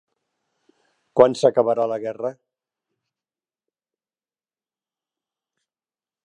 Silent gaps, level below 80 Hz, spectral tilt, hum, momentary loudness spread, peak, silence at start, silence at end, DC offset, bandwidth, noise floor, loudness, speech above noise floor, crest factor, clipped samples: none; -70 dBFS; -6 dB/octave; none; 14 LU; 0 dBFS; 1.15 s; 3.95 s; under 0.1%; 10.5 kHz; under -90 dBFS; -20 LUFS; over 71 dB; 26 dB; under 0.1%